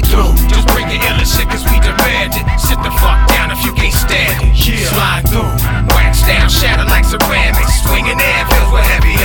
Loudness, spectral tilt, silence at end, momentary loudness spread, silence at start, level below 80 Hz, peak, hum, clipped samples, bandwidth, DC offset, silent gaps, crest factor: -11 LUFS; -4 dB/octave; 0 s; 3 LU; 0 s; -12 dBFS; 0 dBFS; none; under 0.1%; over 20 kHz; under 0.1%; none; 10 dB